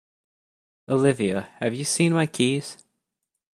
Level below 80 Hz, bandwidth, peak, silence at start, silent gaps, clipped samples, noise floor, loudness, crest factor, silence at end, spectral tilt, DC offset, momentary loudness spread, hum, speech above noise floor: -66 dBFS; 14 kHz; -6 dBFS; 0.9 s; none; under 0.1%; -82 dBFS; -23 LUFS; 20 dB; 0.8 s; -5 dB/octave; under 0.1%; 8 LU; none; 59 dB